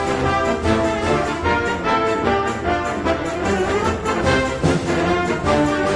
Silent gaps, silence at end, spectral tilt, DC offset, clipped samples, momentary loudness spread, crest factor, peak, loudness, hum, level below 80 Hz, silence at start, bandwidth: none; 0 s; -5.5 dB/octave; under 0.1%; under 0.1%; 3 LU; 16 dB; -2 dBFS; -19 LUFS; none; -36 dBFS; 0 s; 10.5 kHz